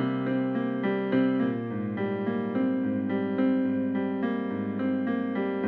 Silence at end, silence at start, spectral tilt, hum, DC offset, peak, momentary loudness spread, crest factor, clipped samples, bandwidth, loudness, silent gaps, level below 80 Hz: 0 s; 0 s; -10 dB/octave; none; under 0.1%; -14 dBFS; 5 LU; 14 dB; under 0.1%; 4.3 kHz; -28 LUFS; none; -72 dBFS